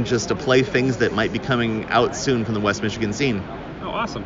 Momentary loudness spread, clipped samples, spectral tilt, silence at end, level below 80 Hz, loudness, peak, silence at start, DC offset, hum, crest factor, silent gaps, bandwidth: 8 LU; under 0.1%; -5 dB/octave; 0 s; -44 dBFS; -21 LUFS; -4 dBFS; 0 s; under 0.1%; none; 18 dB; none; 7.6 kHz